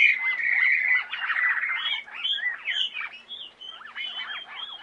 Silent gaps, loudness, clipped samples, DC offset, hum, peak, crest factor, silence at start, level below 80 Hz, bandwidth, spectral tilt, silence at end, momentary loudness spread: none; -24 LUFS; under 0.1%; under 0.1%; none; -6 dBFS; 20 dB; 0 s; -76 dBFS; 9.2 kHz; 1.5 dB/octave; 0 s; 18 LU